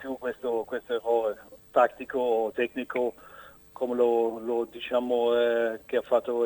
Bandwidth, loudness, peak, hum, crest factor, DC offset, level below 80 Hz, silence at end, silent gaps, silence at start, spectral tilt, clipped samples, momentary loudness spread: 19.5 kHz; -28 LUFS; -8 dBFS; none; 18 dB; under 0.1%; -66 dBFS; 0 s; none; 0 s; -5 dB/octave; under 0.1%; 9 LU